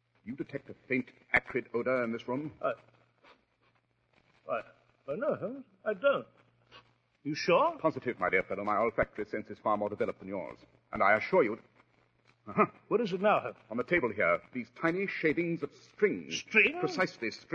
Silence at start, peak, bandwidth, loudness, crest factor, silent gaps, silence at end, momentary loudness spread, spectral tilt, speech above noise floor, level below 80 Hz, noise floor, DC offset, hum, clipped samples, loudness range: 0.25 s; -10 dBFS; 7.8 kHz; -31 LUFS; 22 dB; none; 0 s; 14 LU; -5.5 dB/octave; 40 dB; -66 dBFS; -72 dBFS; under 0.1%; none; under 0.1%; 7 LU